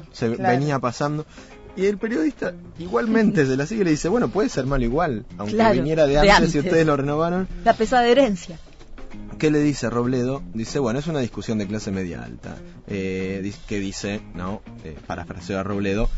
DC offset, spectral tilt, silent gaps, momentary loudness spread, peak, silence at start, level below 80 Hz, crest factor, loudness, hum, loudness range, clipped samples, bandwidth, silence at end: under 0.1%; -6 dB/octave; none; 15 LU; -4 dBFS; 0 s; -36 dBFS; 18 dB; -22 LUFS; none; 10 LU; under 0.1%; 8 kHz; 0 s